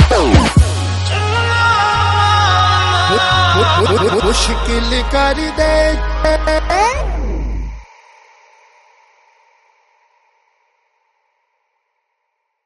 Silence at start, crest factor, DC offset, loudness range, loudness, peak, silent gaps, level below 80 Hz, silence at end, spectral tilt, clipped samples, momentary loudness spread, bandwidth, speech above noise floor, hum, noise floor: 0 s; 14 dB; under 0.1%; 11 LU; -13 LUFS; 0 dBFS; none; -22 dBFS; 4.8 s; -4.5 dB/octave; under 0.1%; 8 LU; 11.5 kHz; 57 dB; none; -71 dBFS